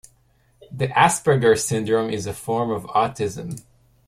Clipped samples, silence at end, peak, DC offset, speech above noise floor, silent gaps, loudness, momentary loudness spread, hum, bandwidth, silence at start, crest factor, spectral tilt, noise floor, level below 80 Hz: under 0.1%; 0.5 s; -2 dBFS; under 0.1%; 39 dB; none; -21 LUFS; 16 LU; none; 15.5 kHz; 0.7 s; 20 dB; -4.5 dB/octave; -60 dBFS; -54 dBFS